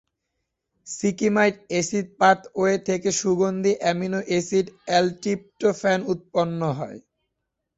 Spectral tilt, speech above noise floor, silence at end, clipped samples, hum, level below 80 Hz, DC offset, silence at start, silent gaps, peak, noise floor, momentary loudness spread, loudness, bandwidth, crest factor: -4.5 dB/octave; 57 dB; 0.75 s; under 0.1%; none; -62 dBFS; under 0.1%; 0.85 s; none; -4 dBFS; -80 dBFS; 7 LU; -23 LUFS; 8.2 kHz; 20 dB